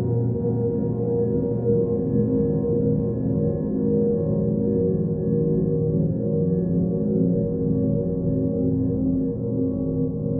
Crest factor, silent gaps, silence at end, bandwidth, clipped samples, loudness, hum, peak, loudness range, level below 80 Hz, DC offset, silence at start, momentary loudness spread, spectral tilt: 14 dB; none; 0 s; 1.8 kHz; under 0.1%; -23 LUFS; none; -8 dBFS; 1 LU; -42 dBFS; under 0.1%; 0 s; 2 LU; -16 dB/octave